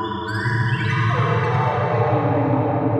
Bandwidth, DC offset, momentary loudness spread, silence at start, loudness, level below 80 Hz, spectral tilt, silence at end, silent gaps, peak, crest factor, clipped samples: 8.8 kHz; under 0.1%; 3 LU; 0 s; -20 LUFS; -50 dBFS; -8 dB/octave; 0 s; none; -6 dBFS; 14 dB; under 0.1%